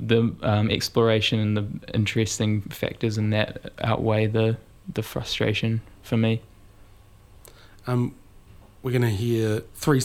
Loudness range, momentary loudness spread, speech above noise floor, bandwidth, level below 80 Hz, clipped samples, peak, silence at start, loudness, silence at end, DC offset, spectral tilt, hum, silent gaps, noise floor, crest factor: 5 LU; 9 LU; 27 dB; 15.5 kHz; -50 dBFS; under 0.1%; -4 dBFS; 0 s; -25 LUFS; 0 s; under 0.1%; -6 dB/octave; none; none; -50 dBFS; 20 dB